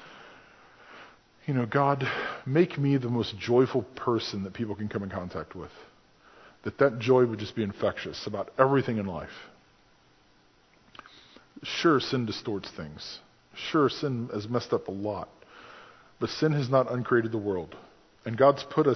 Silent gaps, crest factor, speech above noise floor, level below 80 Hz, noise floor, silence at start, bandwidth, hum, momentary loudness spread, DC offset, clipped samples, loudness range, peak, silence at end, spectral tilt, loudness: none; 24 dB; 35 dB; -60 dBFS; -62 dBFS; 0 s; 6.4 kHz; none; 20 LU; under 0.1%; under 0.1%; 5 LU; -6 dBFS; 0 s; -7 dB/octave; -28 LUFS